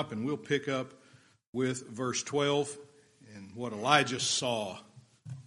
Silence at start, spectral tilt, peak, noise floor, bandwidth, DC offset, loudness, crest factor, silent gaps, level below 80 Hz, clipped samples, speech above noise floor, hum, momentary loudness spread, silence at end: 0 s; -3.5 dB/octave; -8 dBFS; -62 dBFS; 11.5 kHz; under 0.1%; -31 LUFS; 26 dB; 1.47-1.53 s; -76 dBFS; under 0.1%; 30 dB; none; 21 LU; 0.05 s